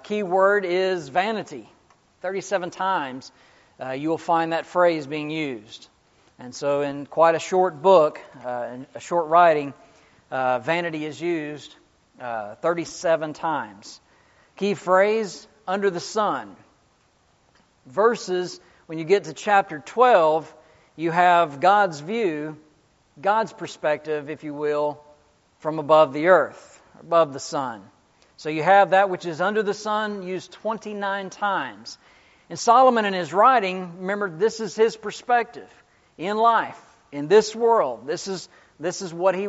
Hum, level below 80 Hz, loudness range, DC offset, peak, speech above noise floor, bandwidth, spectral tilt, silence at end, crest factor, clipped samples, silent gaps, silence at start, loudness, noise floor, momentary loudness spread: none; -70 dBFS; 7 LU; under 0.1%; -2 dBFS; 40 dB; 8 kHz; -3 dB/octave; 0 s; 20 dB; under 0.1%; none; 0.05 s; -22 LUFS; -62 dBFS; 17 LU